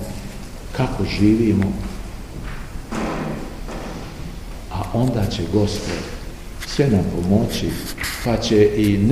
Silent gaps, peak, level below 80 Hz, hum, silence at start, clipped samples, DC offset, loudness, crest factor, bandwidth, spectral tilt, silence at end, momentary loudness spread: none; -2 dBFS; -32 dBFS; none; 0 s; under 0.1%; 0.4%; -21 LUFS; 18 dB; 15.5 kHz; -6.5 dB/octave; 0 s; 18 LU